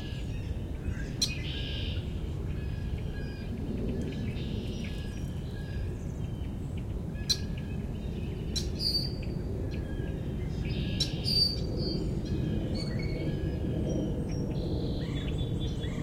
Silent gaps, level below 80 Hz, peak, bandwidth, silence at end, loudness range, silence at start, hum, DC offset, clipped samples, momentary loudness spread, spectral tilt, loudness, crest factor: none; -38 dBFS; -14 dBFS; 16.5 kHz; 0 s; 5 LU; 0 s; none; under 0.1%; under 0.1%; 7 LU; -5.5 dB/octave; -33 LUFS; 20 dB